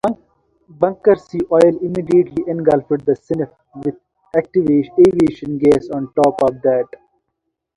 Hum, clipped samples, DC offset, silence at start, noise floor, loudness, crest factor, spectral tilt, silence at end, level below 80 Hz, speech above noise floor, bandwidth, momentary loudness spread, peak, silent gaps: none; under 0.1%; under 0.1%; 0.05 s; -75 dBFS; -16 LUFS; 16 dB; -8 dB/octave; 0.9 s; -50 dBFS; 60 dB; 11 kHz; 12 LU; 0 dBFS; none